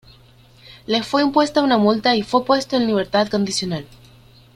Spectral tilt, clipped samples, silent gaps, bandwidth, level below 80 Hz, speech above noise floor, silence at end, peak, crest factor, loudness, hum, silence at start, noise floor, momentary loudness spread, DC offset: -4.5 dB/octave; under 0.1%; none; 14 kHz; -52 dBFS; 31 dB; 0.7 s; -2 dBFS; 18 dB; -18 LUFS; none; 0.7 s; -49 dBFS; 7 LU; under 0.1%